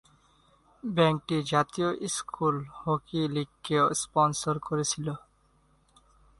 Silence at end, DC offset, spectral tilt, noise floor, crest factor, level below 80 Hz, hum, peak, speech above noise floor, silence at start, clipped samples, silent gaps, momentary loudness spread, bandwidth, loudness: 1.2 s; under 0.1%; -4.5 dB/octave; -65 dBFS; 22 dB; -62 dBFS; none; -8 dBFS; 37 dB; 0.85 s; under 0.1%; none; 8 LU; 11.5 kHz; -28 LUFS